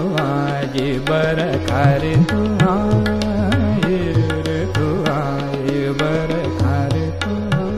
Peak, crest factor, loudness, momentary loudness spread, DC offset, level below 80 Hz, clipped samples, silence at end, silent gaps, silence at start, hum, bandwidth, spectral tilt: -2 dBFS; 14 dB; -18 LUFS; 5 LU; under 0.1%; -34 dBFS; under 0.1%; 0 s; none; 0 s; none; 14.5 kHz; -7 dB/octave